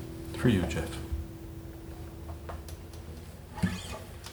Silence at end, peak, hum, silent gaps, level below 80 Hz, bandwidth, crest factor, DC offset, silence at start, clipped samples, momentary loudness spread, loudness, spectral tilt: 0 s; -12 dBFS; none; none; -44 dBFS; over 20 kHz; 22 dB; under 0.1%; 0 s; under 0.1%; 17 LU; -35 LUFS; -6 dB/octave